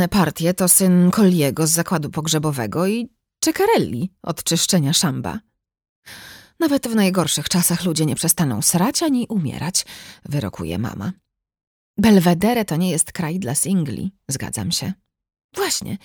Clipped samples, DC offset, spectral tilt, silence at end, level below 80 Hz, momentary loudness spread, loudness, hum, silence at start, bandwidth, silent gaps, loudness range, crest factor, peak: under 0.1%; under 0.1%; -4.5 dB/octave; 0.1 s; -50 dBFS; 14 LU; -19 LUFS; none; 0 s; 20 kHz; 5.89-6.02 s, 11.67-11.94 s, 15.44-15.49 s; 4 LU; 18 dB; -2 dBFS